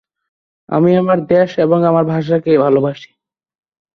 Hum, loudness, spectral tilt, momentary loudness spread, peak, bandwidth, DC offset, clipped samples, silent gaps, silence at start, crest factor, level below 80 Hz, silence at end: none; -14 LUFS; -9 dB/octave; 6 LU; -2 dBFS; 6.4 kHz; under 0.1%; under 0.1%; none; 0.7 s; 14 dB; -56 dBFS; 0.9 s